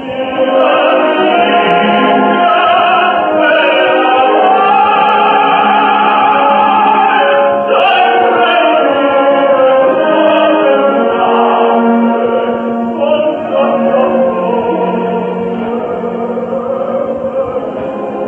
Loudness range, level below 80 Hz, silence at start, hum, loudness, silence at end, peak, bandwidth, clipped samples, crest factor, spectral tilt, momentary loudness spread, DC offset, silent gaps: 5 LU; -54 dBFS; 0 s; none; -10 LUFS; 0 s; 0 dBFS; 4.4 kHz; under 0.1%; 10 dB; -7.5 dB/octave; 8 LU; under 0.1%; none